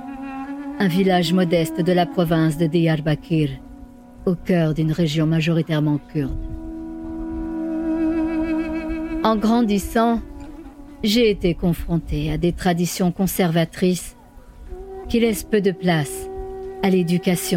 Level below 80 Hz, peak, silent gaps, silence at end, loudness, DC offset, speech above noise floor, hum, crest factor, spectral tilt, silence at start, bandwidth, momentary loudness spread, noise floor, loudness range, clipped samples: -38 dBFS; -4 dBFS; none; 0 s; -21 LUFS; under 0.1%; 23 dB; none; 16 dB; -6 dB/octave; 0 s; 17 kHz; 14 LU; -42 dBFS; 4 LU; under 0.1%